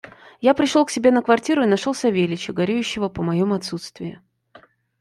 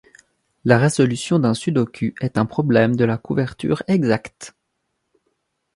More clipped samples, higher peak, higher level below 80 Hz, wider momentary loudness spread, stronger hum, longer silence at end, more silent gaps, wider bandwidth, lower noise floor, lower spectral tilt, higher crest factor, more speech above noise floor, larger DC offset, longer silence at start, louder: neither; about the same, -2 dBFS vs 0 dBFS; about the same, -58 dBFS vs -54 dBFS; first, 13 LU vs 8 LU; neither; second, 0.85 s vs 1.25 s; neither; first, 13 kHz vs 11.5 kHz; second, -51 dBFS vs -74 dBFS; about the same, -5.5 dB/octave vs -6.5 dB/octave; about the same, 18 dB vs 20 dB; second, 32 dB vs 55 dB; neither; second, 0.4 s vs 0.65 s; about the same, -20 LUFS vs -19 LUFS